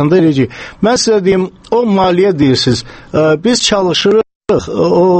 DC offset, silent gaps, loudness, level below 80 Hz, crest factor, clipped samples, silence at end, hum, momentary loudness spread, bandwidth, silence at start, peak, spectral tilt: under 0.1%; 4.35-4.41 s; -12 LUFS; -40 dBFS; 10 dB; under 0.1%; 0 s; none; 6 LU; 8.8 kHz; 0 s; 0 dBFS; -5 dB/octave